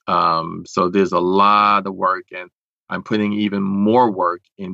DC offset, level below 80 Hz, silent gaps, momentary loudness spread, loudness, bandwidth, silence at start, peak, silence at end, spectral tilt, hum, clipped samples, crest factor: under 0.1%; -62 dBFS; 2.53-2.86 s, 4.52-4.56 s; 15 LU; -17 LUFS; 7.8 kHz; 0.05 s; -2 dBFS; 0 s; -6.5 dB/octave; none; under 0.1%; 16 dB